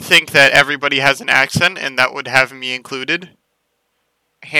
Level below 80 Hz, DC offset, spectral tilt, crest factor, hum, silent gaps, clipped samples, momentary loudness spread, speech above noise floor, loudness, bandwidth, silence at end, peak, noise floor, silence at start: -52 dBFS; under 0.1%; -2.5 dB/octave; 16 dB; none; none; 0.5%; 12 LU; 54 dB; -13 LUFS; over 20 kHz; 0 s; 0 dBFS; -68 dBFS; 0 s